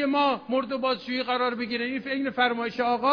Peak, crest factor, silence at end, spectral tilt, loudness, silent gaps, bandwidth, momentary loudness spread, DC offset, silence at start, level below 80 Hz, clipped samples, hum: -10 dBFS; 16 dB; 0 s; -6 dB/octave; -26 LUFS; none; 5.4 kHz; 4 LU; under 0.1%; 0 s; -68 dBFS; under 0.1%; none